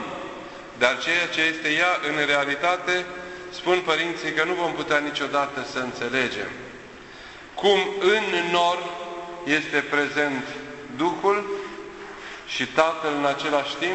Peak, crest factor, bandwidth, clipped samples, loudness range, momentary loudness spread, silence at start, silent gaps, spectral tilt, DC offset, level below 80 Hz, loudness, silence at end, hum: -2 dBFS; 22 dB; 8.4 kHz; under 0.1%; 3 LU; 16 LU; 0 s; none; -3.5 dB/octave; under 0.1%; -60 dBFS; -23 LUFS; 0 s; none